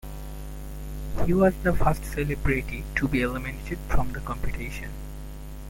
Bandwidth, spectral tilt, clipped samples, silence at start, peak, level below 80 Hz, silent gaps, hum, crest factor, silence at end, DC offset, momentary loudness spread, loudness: 17 kHz; -7 dB/octave; under 0.1%; 0.05 s; -8 dBFS; -32 dBFS; none; none; 18 dB; 0 s; under 0.1%; 17 LU; -27 LUFS